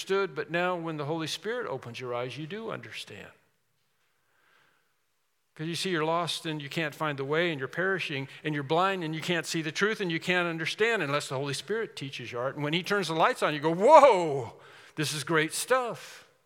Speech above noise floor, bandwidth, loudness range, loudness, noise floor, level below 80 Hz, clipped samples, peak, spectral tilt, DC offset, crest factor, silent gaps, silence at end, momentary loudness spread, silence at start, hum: 49 dB; 17.5 kHz; 15 LU; -28 LUFS; -77 dBFS; -82 dBFS; under 0.1%; -4 dBFS; -4.5 dB/octave; under 0.1%; 24 dB; none; 0.25 s; 12 LU; 0 s; none